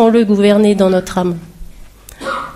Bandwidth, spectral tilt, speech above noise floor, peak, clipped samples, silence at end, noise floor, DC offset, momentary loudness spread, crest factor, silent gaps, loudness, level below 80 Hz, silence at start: 14.5 kHz; -6.5 dB/octave; 25 dB; 0 dBFS; under 0.1%; 0 s; -36 dBFS; under 0.1%; 14 LU; 14 dB; none; -13 LUFS; -38 dBFS; 0 s